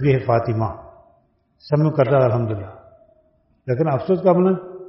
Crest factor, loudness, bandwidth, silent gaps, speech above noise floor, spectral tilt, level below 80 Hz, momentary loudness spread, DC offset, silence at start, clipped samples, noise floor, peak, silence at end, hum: 16 dB; -19 LUFS; 5.8 kHz; none; 42 dB; -8.5 dB/octave; -52 dBFS; 13 LU; under 0.1%; 0 s; under 0.1%; -60 dBFS; -4 dBFS; 0 s; none